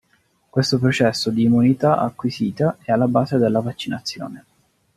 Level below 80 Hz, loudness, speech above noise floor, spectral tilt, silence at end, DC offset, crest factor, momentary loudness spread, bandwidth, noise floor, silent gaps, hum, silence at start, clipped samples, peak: -58 dBFS; -19 LUFS; 44 dB; -6.5 dB/octave; 0.55 s; under 0.1%; 18 dB; 11 LU; 13 kHz; -63 dBFS; none; none; 0.55 s; under 0.1%; -2 dBFS